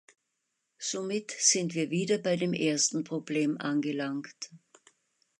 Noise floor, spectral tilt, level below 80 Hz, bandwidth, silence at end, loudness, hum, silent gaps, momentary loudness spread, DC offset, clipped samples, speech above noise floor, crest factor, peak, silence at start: -81 dBFS; -3.5 dB/octave; -80 dBFS; 11 kHz; 0.85 s; -29 LUFS; none; none; 13 LU; under 0.1%; under 0.1%; 51 dB; 22 dB; -8 dBFS; 0.8 s